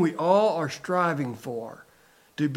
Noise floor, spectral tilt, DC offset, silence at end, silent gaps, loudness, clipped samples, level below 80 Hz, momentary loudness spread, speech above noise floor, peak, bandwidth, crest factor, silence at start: -59 dBFS; -6.5 dB/octave; under 0.1%; 0 s; none; -26 LUFS; under 0.1%; -74 dBFS; 16 LU; 33 dB; -8 dBFS; 16.5 kHz; 18 dB; 0 s